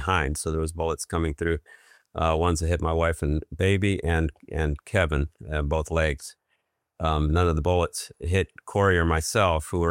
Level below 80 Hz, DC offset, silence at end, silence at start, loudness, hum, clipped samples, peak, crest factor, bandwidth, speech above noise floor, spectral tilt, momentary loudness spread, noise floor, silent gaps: -36 dBFS; under 0.1%; 0 s; 0 s; -25 LUFS; none; under 0.1%; -6 dBFS; 20 dB; 16 kHz; 50 dB; -5.5 dB/octave; 7 LU; -75 dBFS; none